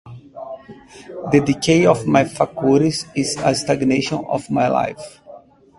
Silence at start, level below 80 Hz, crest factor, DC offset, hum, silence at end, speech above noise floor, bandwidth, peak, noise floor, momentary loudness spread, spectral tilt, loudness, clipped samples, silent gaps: 0.05 s; -50 dBFS; 18 dB; under 0.1%; none; 0.4 s; 25 dB; 11.5 kHz; 0 dBFS; -43 dBFS; 21 LU; -5.5 dB/octave; -18 LUFS; under 0.1%; none